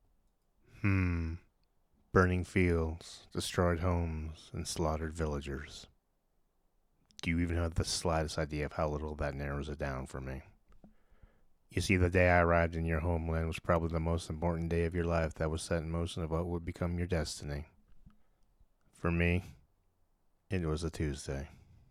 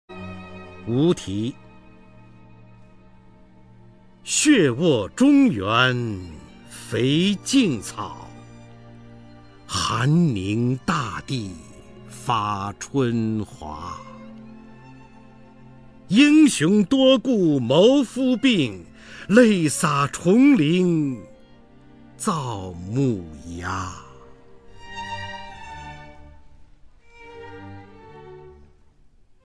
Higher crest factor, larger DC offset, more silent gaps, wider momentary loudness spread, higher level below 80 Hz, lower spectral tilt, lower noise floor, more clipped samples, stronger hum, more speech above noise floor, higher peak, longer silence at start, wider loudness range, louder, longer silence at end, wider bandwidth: about the same, 24 dB vs 22 dB; second, under 0.1% vs 0.2%; neither; second, 13 LU vs 24 LU; about the same, -48 dBFS vs -52 dBFS; about the same, -6 dB/octave vs -5 dB/octave; first, -75 dBFS vs -54 dBFS; neither; neither; first, 42 dB vs 34 dB; second, -12 dBFS vs 0 dBFS; first, 0.75 s vs 0.1 s; second, 8 LU vs 16 LU; second, -34 LUFS vs -20 LUFS; second, 0.4 s vs 0.95 s; about the same, 14 kHz vs 13 kHz